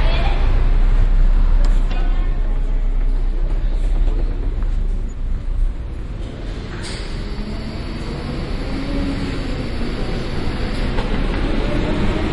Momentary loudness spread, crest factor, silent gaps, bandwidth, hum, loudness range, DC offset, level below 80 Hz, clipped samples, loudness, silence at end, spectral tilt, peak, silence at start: 8 LU; 12 dB; none; 8.2 kHz; none; 6 LU; under 0.1%; -18 dBFS; under 0.1%; -23 LUFS; 0 s; -6.5 dB/octave; -4 dBFS; 0 s